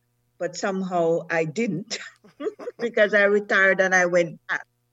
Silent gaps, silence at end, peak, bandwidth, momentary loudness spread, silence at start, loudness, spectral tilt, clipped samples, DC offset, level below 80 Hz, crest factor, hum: none; 0.3 s; -6 dBFS; 8.2 kHz; 15 LU; 0.4 s; -22 LUFS; -4.5 dB/octave; under 0.1%; under 0.1%; -76 dBFS; 18 dB; none